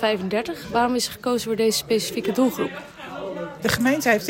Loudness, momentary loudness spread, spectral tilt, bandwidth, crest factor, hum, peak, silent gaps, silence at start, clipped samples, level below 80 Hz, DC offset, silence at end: -23 LUFS; 12 LU; -3.5 dB/octave; 16.5 kHz; 16 dB; none; -6 dBFS; none; 0 s; under 0.1%; -54 dBFS; under 0.1%; 0 s